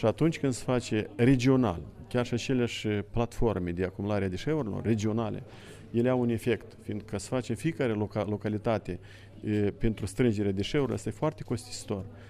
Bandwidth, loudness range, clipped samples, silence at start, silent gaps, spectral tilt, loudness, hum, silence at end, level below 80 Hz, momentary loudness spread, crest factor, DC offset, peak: 14 kHz; 3 LU; under 0.1%; 0 s; none; -6.5 dB/octave; -30 LUFS; none; 0 s; -46 dBFS; 10 LU; 18 dB; under 0.1%; -10 dBFS